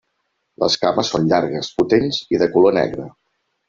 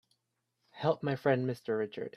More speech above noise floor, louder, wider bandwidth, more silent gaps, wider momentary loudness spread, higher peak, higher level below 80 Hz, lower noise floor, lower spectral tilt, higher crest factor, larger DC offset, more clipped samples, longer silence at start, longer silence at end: first, 54 dB vs 50 dB; first, -18 LUFS vs -33 LUFS; second, 7.6 kHz vs 13.5 kHz; neither; first, 9 LU vs 5 LU; first, -2 dBFS vs -14 dBFS; first, -52 dBFS vs -76 dBFS; second, -71 dBFS vs -82 dBFS; second, -5 dB/octave vs -8 dB/octave; about the same, 16 dB vs 20 dB; neither; neither; second, 0.6 s vs 0.75 s; first, 0.6 s vs 0.05 s